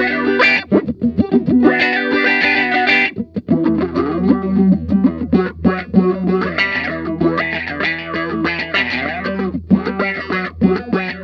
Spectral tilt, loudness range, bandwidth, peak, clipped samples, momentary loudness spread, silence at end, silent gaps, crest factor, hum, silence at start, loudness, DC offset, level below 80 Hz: -7.5 dB/octave; 5 LU; 7 kHz; 0 dBFS; under 0.1%; 8 LU; 0 s; none; 16 dB; none; 0 s; -16 LUFS; under 0.1%; -40 dBFS